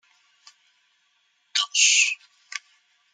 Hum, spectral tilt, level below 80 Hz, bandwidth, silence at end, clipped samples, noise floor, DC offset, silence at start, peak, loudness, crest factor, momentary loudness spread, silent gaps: none; 11 dB/octave; under -90 dBFS; 13.5 kHz; 0.55 s; under 0.1%; -68 dBFS; under 0.1%; 1.55 s; -4 dBFS; -19 LUFS; 24 dB; 21 LU; none